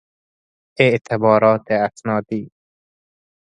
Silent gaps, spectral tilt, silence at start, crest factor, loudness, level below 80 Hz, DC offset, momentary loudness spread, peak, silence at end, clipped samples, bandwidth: none; -7 dB/octave; 0.8 s; 20 dB; -17 LUFS; -60 dBFS; under 0.1%; 10 LU; 0 dBFS; 0.95 s; under 0.1%; 9.6 kHz